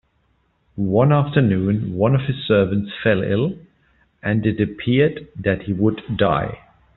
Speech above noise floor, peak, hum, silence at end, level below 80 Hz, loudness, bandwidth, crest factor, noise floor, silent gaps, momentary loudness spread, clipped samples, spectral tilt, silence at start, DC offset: 45 dB; -2 dBFS; none; 0.4 s; -48 dBFS; -19 LUFS; 4.2 kHz; 16 dB; -64 dBFS; none; 9 LU; under 0.1%; -6.5 dB/octave; 0.75 s; under 0.1%